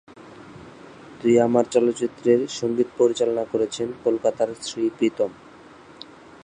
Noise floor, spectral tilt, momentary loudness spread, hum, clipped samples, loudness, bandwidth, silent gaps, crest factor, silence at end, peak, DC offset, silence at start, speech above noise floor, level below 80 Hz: -46 dBFS; -5 dB/octave; 23 LU; none; under 0.1%; -22 LUFS; 10.5 kHz; none; 18 dB; 1.1 s; -4 dBFS; under 0.1%; 0.15 s; 25 dB; -64 dBFS